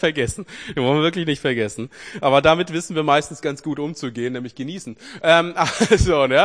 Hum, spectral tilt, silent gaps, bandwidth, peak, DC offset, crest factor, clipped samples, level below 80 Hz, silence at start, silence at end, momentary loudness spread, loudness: none; -4.5 dB/octave; none; 10.5 kHz; 0 dBFS; 0.1%; 20 dB; under 0.1%; -38 dBFS; 0 s; 0 s; 15 LU; -19 LUFS